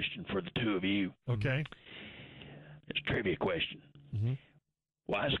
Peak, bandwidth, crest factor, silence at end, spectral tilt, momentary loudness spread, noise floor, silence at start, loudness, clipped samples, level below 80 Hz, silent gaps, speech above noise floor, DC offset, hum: -22 dBFS; 6.2 kHz; 14 dB; 0 s; -8 dB/octave; 18 LU; -79 dBFS; 0 s; -35 LUFS; under 0.1%; -58 dBFS; none; 45 dB; under 0.1%; none